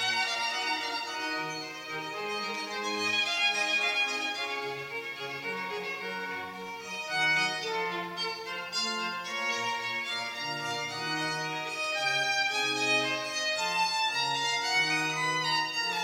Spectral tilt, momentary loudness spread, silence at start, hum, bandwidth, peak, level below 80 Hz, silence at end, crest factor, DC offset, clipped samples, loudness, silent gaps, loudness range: -1.5 dB/octave; 10 LU; 0 s; none; 16 kHz; -16 dBFS; -78 dBFS; 0 s; 16 dB; under 0.1%; under 0.1%; -29 LUFS; none; 4 LU